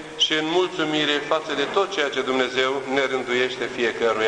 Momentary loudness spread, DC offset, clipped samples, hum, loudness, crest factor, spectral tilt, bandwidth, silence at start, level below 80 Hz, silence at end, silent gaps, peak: 3 LU; under 0.1%; under 0.1%; none; -22 LUFS; 16 dB; -3 dB/octave; 10.5 kHz; 0 s; -62 dBFS; 0 s; none; -6 dBFS